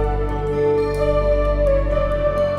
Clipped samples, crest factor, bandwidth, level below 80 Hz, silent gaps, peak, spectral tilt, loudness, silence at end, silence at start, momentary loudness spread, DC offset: under 0.1%; 10 dB; 10.5 kHz; -24 dBFS; none; -8 dBFS; -8 dB/octave; -19 LUFS; 0 s; 0 s; 4 LU; under 0.1%